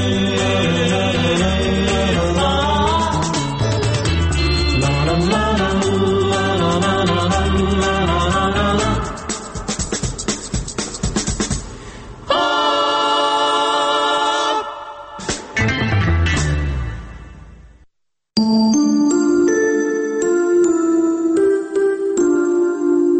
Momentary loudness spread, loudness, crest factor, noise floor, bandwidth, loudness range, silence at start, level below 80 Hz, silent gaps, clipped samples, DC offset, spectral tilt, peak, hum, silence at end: 9 LU; -17 LUFS; 14 dB; -65 dBFS; 8.8 kHz; 5 LU; 0 s; -28 dBFS; none; under 0.1%; under 0.1%; -5 dB/octave; -4 dBFS; none; 0 s